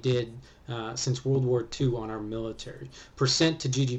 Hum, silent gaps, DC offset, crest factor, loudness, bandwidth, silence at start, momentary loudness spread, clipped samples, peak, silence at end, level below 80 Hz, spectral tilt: none; none; under 0.1%; 18 dB; -28 LUFS; 8.4 kHz; 0 s; 17 LU; under 0.1%; -12 dBFS; 0 s; -52 dBFS; -5 dB/octave